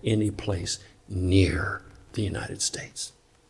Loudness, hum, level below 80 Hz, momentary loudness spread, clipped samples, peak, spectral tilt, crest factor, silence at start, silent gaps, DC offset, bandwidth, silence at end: -28 LUFS; none; -48 dBFS; 14 LU; under 0.1%; -8 dBFS; -5 dB/octave; 20 dB; 0.05 s; none; under 0.1%; 12 kHz; 0.4 s